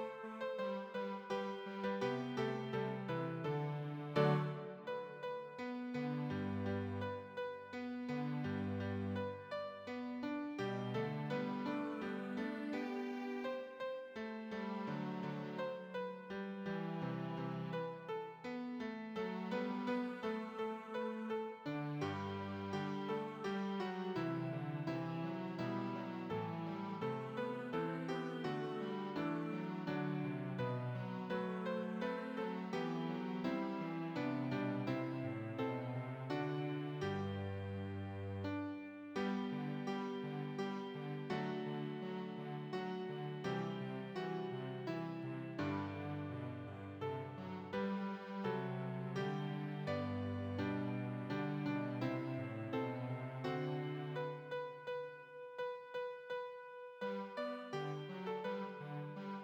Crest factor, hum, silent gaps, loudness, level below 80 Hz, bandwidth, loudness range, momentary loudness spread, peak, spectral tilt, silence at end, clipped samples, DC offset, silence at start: 20 dB; none; none; -43 LUFS; -80 dBFS; 9.2 kHz; 3 LU; 5 LU; -22 dBFS; -8 dB/octave; 0 s; under 0.1%; under 0.1%; 0 s